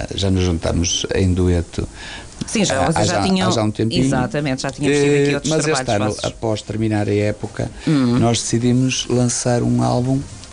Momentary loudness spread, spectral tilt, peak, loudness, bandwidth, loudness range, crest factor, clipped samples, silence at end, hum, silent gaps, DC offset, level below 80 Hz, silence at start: 7 LU; -5 dB/octave; -6 dBFS; -18 LUFS; 10.5 kHz; 2 LU; 12 dB; under 0.1%; 0 s; none; none; under 0.1%; -36 dBFS; 0 s